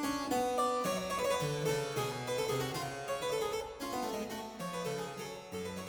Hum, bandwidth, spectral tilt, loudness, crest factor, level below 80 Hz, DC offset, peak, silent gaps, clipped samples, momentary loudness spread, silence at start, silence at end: none; over 20 kHz; -4 dB/octave; -36 LUFS; 16 dB; -62 dBFS; under 0.1%; -20 dBFS; none; under 0.1%; 9 LU; 0 s; 0 s